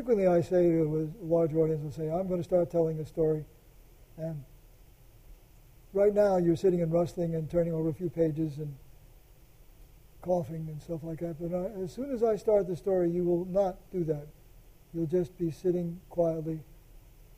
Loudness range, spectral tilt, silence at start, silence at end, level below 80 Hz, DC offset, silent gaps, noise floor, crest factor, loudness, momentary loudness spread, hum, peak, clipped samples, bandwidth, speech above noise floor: 7 LU; -9 dB/octave; 0 s; 0.4 s; -54 dBFS; under 0.1%; none; -56 dBFS; 16 dB; -30 LUFS; 13 LU; none; -14 dBFS; under 0.1%; 15.5 kHz; 27 dB